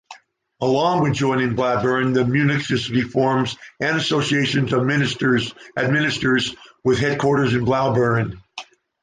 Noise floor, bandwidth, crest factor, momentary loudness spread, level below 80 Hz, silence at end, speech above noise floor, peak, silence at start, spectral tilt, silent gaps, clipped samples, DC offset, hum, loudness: -46 dBFS; 9.8 kHz; 14 dB; 7 LU; -50 dBFS; 0.4 s; 26 dB; -6 dBFS; 0.1 s; -6 dB/octave; none; under 0.1%; under 0.1%; none; -20 LUFS